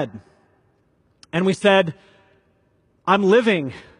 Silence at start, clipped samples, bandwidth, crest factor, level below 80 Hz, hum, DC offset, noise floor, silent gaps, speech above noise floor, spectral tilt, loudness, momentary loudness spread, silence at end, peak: 0 s; under 0.1%; 11 kHz; 20 dB; -64 dBFS; none; under 0.1%; -62 dBFS; none; 44 dB; -6 dB/octave; -19 LUFS; 12 LU; 0.2 s; -2 dBFS